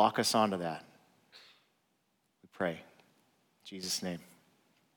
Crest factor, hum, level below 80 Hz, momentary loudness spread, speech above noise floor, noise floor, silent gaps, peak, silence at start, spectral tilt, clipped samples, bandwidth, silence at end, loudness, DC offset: 24 dB; none; -82 dBFS; 19 LU; 44 dB; -77 dBFS; none; -12 dBFS; 0 s; -3.5 dB/octave; under 0.1%; 19.5 kHz; 0.75 s; -34 LUFS; under 0.1%